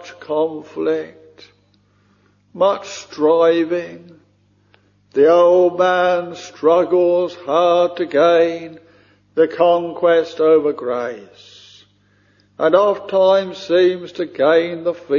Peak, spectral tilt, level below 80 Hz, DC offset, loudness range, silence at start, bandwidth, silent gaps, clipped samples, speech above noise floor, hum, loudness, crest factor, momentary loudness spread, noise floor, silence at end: 0 dBFS; -5.5 dB/octave; -64 dBFS; under 0.1%; 5 LU; 0 s; 7.2 kHz; none; under 0.1%; 41 dB; 50 Hz at -55 dBFS; -16 LUFS; 16 dB; 12 LU; -57 dBFS; 0 s